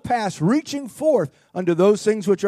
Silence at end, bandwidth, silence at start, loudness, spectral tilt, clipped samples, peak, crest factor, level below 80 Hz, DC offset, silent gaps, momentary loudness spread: 0 s; 14 kHz; 0.05 s; -20 LUFS; -6 dB/octave; under 0.1%; -6 dBFS; 14 dB; -62 dBFS; under 0.1%; none; 9 LU